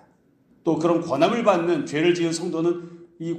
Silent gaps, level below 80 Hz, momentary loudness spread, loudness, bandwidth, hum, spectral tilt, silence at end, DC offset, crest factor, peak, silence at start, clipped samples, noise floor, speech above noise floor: none; -68 dBFS; 11 LU; -22 LUFS; 9.8 kHz; none; -5.5 dB/octave; 0 s; under 0.1%; 18 dB; -4 dBFS; 0.65 s; under 0.1%; -59 dBFS; 38 dB